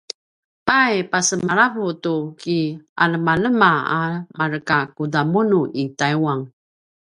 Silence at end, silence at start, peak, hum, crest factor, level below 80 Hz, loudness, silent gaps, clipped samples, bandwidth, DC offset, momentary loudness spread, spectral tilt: 0.6 s; 0.65 s; 0 dBFS; none; 20 dB; -58 dBFS; -19 LUFS; 2.89-2.96 s; under 0.1%; 11.5 kHz; under 0.1%; 10 LU; -4.5 dB/octave